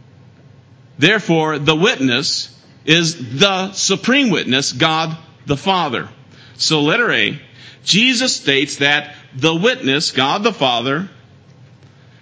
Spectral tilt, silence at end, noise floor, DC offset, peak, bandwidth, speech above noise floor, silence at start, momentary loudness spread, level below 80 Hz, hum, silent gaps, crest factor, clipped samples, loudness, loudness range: -3.5 dB/octave; 1.1 s; -45 dBFS; under 0.1%; 0 dBFS; 8 kHz; 29 dB; 1 s; 10 LU; -56 dBFS; none; none; 18 dB; under 0.1%; -15 LUFS; 2 LU